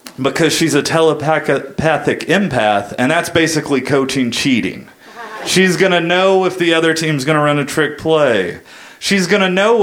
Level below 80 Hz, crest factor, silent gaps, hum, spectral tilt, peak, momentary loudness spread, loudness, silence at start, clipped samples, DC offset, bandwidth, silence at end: -50 dBFS; 14 dB; none; none; -4.5 dB/octave; 0 dBFS; 6 LU; -14 LUFS; 0.05 s; under 0.1%; under 0.1%; 17 kHz; 0 s